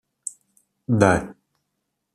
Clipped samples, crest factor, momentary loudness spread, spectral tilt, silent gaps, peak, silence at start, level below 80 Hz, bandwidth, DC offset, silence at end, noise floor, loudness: under 0.1%; 22 dB; 22 LU; -6 dB/octave; none; -2 dBFS; 0.9 s; -52 dBFS; 13.5 kHz; under 0.1%; 0.85 s; -78 dBFS; -20 LUFS